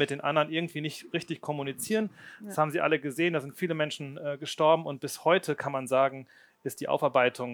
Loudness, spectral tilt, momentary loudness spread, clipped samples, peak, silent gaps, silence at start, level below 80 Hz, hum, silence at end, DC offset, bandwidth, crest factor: -29 LUFS; -5 dB/octave; 11 LU; under 0.1%; -8 dBFS; none; 0 s; -80 dBFS; none; 0 s; under 0.1%; over 20 kHz; 20 dB